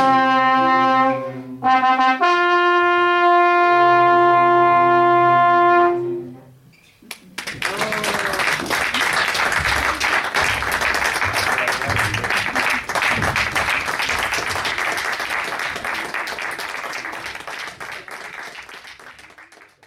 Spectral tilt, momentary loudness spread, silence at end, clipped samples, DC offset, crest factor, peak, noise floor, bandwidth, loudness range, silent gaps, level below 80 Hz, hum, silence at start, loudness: -3.5 dB/octave; 16 LU; 0.45 s; under 0.1%; under 0.1%; 14 dB; -4 dBFS; -50 dBFS; 16 kHz; 11 LU; none; -46 dBFS; none; 0 s; -17 LUFS